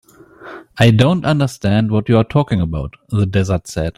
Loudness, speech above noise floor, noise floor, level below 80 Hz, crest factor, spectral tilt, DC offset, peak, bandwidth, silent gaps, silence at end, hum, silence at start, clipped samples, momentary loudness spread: -16 LUFS; 24 dB; -38 dBFS; -38 dBFS; 14 dB; -7 dB/octave; under 0.1%; 0 dBFS; 13 kHz; none; 0.05 s; none; 0.4 s; under 0.1%; 12 LU